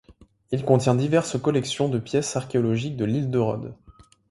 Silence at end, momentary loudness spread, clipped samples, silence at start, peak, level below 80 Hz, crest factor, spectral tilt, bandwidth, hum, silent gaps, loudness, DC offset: 0.4 s; 8 LU; under 0.1%; 0.1 s; -4 dBFS; -56 dBFS; 20 dB; -6 dB/octave; 11.5 kHz; none; none; -24 LUFS; under 0.1%